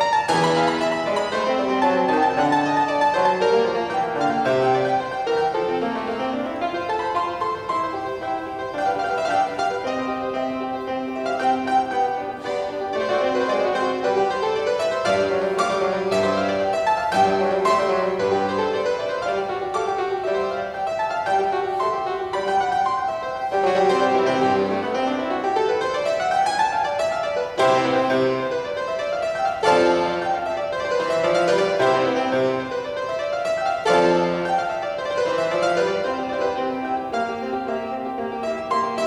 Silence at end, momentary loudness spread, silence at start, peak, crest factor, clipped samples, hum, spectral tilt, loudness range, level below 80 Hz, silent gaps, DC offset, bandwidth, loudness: 0 s; 7 LU; 0 s; -6 dBFS; 16 dB; under 0.1%; none; -4.5 dB/octave; 4 LU; -56 dBFS; none; under 0.1%; 12.5 kHz; -22 LUFS